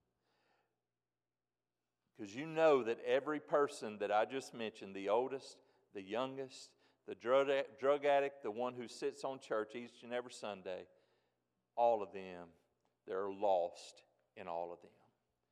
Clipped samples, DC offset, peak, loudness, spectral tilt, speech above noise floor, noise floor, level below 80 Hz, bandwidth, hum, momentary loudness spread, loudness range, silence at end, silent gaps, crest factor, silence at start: under 0.1%; under 0.1%; -20 dBFS; -38 LUFS; -4.5 dB/octave; over 52 dB; under -90 dBFS; under -90 dBFS; 11.5 kHz; 60 Hz at -80 dBFS; 18 LU; 6 LU; 0.65 s; none; 20 dB; 2.2 s